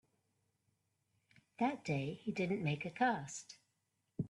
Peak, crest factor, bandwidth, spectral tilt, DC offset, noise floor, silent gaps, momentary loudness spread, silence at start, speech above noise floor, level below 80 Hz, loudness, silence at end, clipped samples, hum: -20 dBFS; 20 dB; 11.5 kHz; -5.5 dB/octave; under 0.1%; -84 dBFS; none; 16 LU; 1.6 s; 46 dB; -76 dBFS; -39 LUFS; 0 s; under 0.1%; none